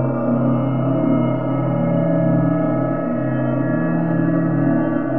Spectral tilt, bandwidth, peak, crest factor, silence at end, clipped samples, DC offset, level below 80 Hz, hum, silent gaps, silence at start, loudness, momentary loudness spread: -13 dB/octave; 3.3 kHz; -6 dBFS; 12 dB; 0 s; under 0.1%; 2%; -50 dBFS; none; none; 0 s; -19 LUFS; 3 LU